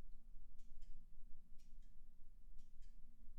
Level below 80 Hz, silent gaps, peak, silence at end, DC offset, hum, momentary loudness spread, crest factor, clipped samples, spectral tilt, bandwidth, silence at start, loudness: -56 dBFS; none; -38 dBFS; 0 s; under 0.1%; none; 3 LU; 10 dB; under 0.1%; -6 dB/octave; 0.4 kHz; 0 s; -68 LUFS